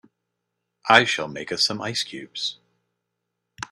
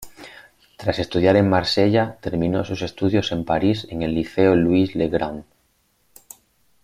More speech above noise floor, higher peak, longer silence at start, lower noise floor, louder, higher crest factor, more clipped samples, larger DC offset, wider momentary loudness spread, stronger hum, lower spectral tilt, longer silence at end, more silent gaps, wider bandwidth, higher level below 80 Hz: first, 58 dB vs 45 dB; about the same, 0 dBFS vs -2 dBFS; first, 0.85 s vs 0 s; first, -80 dBFS vs -64 dBFS; about the same, -22 LUFS vs -20 LUFS; first, 26 dB vs 18 dB; neither; neither; first, 14 LU vs 11 LU; neither; second, -2.5 dB/octave vs -6.5 dB/octave; second, 0.05 s vs 1.4 s; neither; about the same, 15 kHz vs 16 kHz; second, -66 dBFS vs -48 dBFS